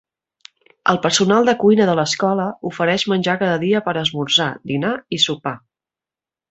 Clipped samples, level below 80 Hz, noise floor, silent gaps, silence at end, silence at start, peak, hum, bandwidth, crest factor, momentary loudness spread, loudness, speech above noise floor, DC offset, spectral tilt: under 0.1%; -60 dBFS; -90 dBFS; none; 0.95 s; 0.85 s; 0 dBFS; none; 8.2 kHz; 18 dB; 8 LU; -17 LUFS; 72 dB; under 0.1%; -4 dB/octave